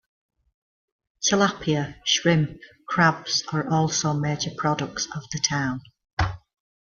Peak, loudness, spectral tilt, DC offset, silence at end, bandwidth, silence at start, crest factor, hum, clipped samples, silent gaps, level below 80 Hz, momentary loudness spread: -4 dBFS; -24 LUFS; -4 dB/octave; under 0.1%; 0.55 s; 7.2 kHz; 1.2 s; 20 dB; none; under 0.1%; 6.13-6.17 s; -48 dBFS; 9 LU